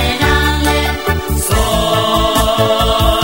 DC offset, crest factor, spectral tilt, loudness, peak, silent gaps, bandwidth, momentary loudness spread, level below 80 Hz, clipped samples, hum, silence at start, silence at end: 1%; 12 dB; -4 dB/octave; -13 LUFS; 0 dBFS; none; over 20 kHz; 4 LU; -20 dBFS; under 0.1%; none; 0 s; 0 s